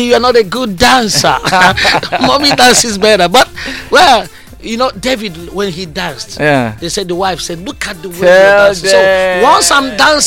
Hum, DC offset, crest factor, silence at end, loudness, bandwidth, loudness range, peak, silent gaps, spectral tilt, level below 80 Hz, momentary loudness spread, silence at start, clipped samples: none; under 0.1%; 10 dB; 0 s; -9 LUFS; 17 kHz; 7 LU; 0 dBFS; none; -2.5 dB/octave; -34 dBFS; 13 LU; 0 s; 0.2%